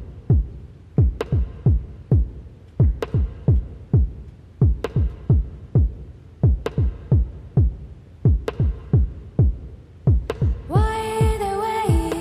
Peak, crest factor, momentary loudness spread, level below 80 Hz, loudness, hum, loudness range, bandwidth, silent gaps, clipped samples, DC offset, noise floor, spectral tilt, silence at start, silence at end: -8 dBFS; 12 dB; 8 LU; -26 dBFS; -22 LUFS; none; 1 LU; 14 kHz; none; under 0.1%; under 0.1%; -39 dBFS; -8.5 dB/octave; 0 s; 0 s